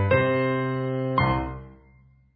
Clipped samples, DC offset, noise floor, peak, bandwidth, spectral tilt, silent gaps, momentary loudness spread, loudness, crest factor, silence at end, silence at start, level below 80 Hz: under 0.1%; under 0.1%; -56 dBFS; -8 dBFS; 5.2 kHz; -11.5 dB/octave; none; 11 LU; -25 LUFS; 16 dB; 0.6 s; 0 s; -42 dBFS